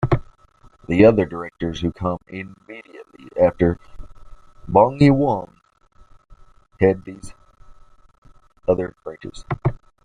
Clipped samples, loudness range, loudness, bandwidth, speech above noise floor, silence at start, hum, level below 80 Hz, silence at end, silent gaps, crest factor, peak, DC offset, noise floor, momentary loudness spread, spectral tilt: under 0.1%; 6 LU; -19 LUFS; 10.5 kHz; 33 dB; 0 s; none; -42 dBFS; 0.3 s; 8.18-8.22 s; 20 dB; -2 dBFS; under 0.1%; -52 dBFS; 23 LU; -8.5 dB/octave